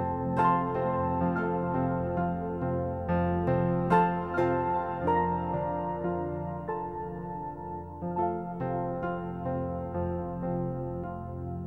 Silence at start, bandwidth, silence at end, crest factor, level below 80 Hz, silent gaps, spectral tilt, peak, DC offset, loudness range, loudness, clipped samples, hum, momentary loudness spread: 0 s; 4.5 kHz; 0 s; 18 dB; -50 dBFS; none; -10 dB/octave; -12 dBFS; 0.1%; 6 LU; -30 LUFS; under 0.1%; none; 11 LU